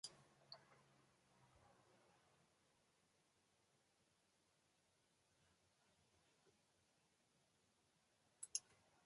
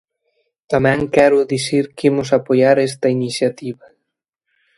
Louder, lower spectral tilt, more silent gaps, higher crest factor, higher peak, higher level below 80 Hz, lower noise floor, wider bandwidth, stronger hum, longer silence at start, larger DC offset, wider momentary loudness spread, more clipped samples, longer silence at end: second, -52 LUFS vs -16 LUFS; second, 0 dB/octave vs -5.5 dB/octave; neither; first, 40 dB vs 18 dB; second, -26 dBFS vs 0 dBFS; second, under -90 dBFS vs -52 dBFS; first, -82 dBFS vs -77 dBFS; about the same, 11 kHz vs 11.5 kHz; neither; second, 0.05 s vs 0.7 s; neither; first, 14 LU vs 8 LU; neither; second, 0 s vs 1.05 s